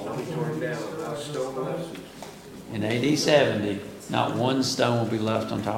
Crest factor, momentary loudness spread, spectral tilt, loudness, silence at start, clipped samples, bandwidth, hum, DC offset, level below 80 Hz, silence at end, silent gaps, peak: 20 dB; 16 LU; -5 dB/octave; -26 LUFS; 0 s; under 0.1%; 17 kHz; none; under 0.1%; -60 dBFS; 0 s; none; -6 dBFS